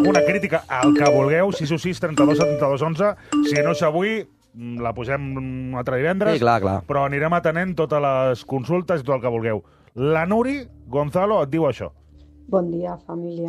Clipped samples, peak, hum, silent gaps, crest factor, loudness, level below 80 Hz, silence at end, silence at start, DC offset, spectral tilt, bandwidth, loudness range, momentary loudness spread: under 0.1%; 0 dBFS; none; none; 20 dB; -21 LUFS; -50 dBFS; 0 s; 0 s; under 0.1%; -6.5 dB/octave; 14 kHz; 4 LU; 11 LU